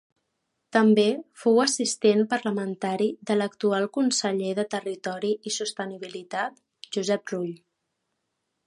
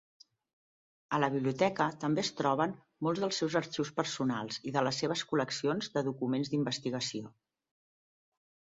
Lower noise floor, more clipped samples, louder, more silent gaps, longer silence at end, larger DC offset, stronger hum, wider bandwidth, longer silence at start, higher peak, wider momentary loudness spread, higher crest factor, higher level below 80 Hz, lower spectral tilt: second, -79 dBFS vs under -90 dBFS; neither; first, -25 LUFS vs -33 LUFS; neither; second, 1.1 s vs 1.45 s; neither; neither; first, 11.5 kHz vs 8 kHz; second, 0.75 s vs 1.1 s; first, -6 dBFS vs -14 dBFS; first, 12 LU vs 6 LU; about the same, 20 dB vs 20 dB; about the same, -78 dBFS vs -74 dBFS; about the same, -4 dB/octave vs -5 dB/octave